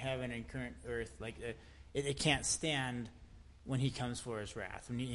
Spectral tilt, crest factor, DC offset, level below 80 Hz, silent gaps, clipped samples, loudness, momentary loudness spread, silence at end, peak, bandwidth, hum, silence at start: -4 dB/octave; 24 dB; under 0.1%; -56 dBFS; none; under 0.1%; -39 LUFS; 13 LU; 0 s; -16 dBFS; 11.5 kHz; none; 0 s